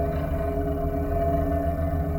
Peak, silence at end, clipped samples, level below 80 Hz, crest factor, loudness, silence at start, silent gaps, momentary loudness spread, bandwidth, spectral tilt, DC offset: -14 dBFS; 0 s; under 0.1%; -30 dBFS; 12 dB; -26 LUFS; 0 s; none; 3 LU; 18 kHz; -9.5 dB/octave; under 0.1%